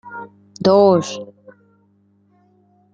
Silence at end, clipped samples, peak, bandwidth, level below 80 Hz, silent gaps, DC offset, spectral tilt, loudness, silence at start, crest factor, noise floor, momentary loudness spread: 1.7 s; under 0.1%; -2 dBFS; 7.8 kHz; -62 dBFS; none; under 0.1%; -6 dB/octave; -15 LUFS; 0.05 s; 18 dB; -58 dBFS; 26 LU